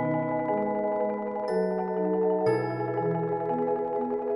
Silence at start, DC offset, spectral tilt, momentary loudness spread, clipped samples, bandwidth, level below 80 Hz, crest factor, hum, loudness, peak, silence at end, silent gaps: 0 s; under 0.1%; -9 dB/octave; 4 LU; under 0.1%; 10.5 kHz; -68 dBFS; 14 dB; none; -28 LUFS; -14 dBFS; 0 s; none